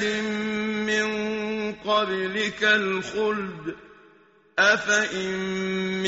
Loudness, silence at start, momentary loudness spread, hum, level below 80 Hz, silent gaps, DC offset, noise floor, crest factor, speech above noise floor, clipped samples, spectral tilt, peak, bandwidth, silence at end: -24 LUFS; 0 s; 10 LU; none; -62 dBFS; none; under 0.1%; -57 dBFS; 20 dB; 33 dB; under 0.1%; -2 dB/octave; -6 dBFS; 8 kHz; 0 s